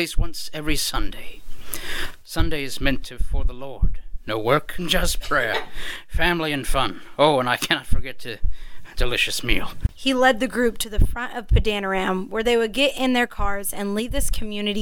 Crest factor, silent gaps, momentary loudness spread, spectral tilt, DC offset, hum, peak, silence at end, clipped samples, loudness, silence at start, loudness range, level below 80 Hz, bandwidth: 18 dB; none; 13 LU; -4 dB/octave; under 0.1%; none; -2 dBFS; 0 s; under 0.1%; -23 LUFS; 0 s; 5 LU; -28 dBFS; 18 kHz